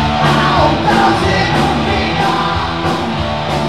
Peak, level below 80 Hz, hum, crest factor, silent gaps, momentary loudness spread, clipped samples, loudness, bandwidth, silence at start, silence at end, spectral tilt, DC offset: 0 dBFS; -28 dBFS; none; 12 dB; none; 6 LU; under 0.1%; -13 LUFS; 13.5 kHz; 0 s; 0 s; -5.5 dB/octave; 1%